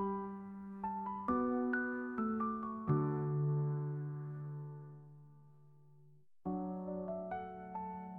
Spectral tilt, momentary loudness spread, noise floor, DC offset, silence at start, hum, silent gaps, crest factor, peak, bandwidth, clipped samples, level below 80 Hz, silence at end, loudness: -11.5 dB/octave; 13 LU; -66 dBFS; under 0.1%; 0 s; none; none; 16 dB; -22 dBFS; 3.2 kHz; under 0.1%; -70 dBFS; 0 s; -39 LUFS